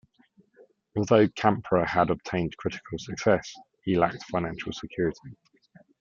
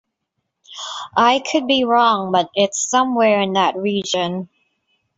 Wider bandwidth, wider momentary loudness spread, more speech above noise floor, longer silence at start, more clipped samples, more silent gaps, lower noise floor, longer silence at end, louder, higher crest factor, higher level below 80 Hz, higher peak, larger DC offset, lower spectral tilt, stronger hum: about the same, 7.6 kHz vs 8 kHz; about the same, 13 LU vs 14 LU; second, 36 dB vs 59 dB; first, 0.95 s vs 0.7 s; neither; neither; second, -62 dBFS vs -75 dBFS; about the same, 0.65 s vs 0.7 s; second, -27 LUFS vs -17 LUFS; first, 24 dB vs 16 dB; first, -56 dBFS vs -64 dBFS; about the same, -4 dBFS vs -2 dBFS; neither; first, -6 dB/octave vs -3.5 dB/octave; neither